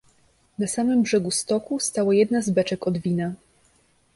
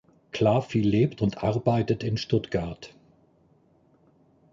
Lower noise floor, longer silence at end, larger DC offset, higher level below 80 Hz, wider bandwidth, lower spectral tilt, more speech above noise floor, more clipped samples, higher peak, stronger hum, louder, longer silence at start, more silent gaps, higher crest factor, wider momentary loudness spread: about the same, -62 dBFS vs -62 dBFS; second, 0.8 s vs 1.65 s; neither; second, -60 dBFS vs -52 dBFS; first, 11.5 kHz vs 7.6 kHz; second, -5 dB/octave vs -7.5 dB/octave; about the same, 40 dB vs 37 dB; neither; about the same, -8 dBFS vs -10 dBFS; neither; first, -23 LUFS vs -26 LUFS; first, 0.6 s vs 0.35 s; neither; about the same, 16 dB vs 18 dB; second, 9 LU vs 14 LU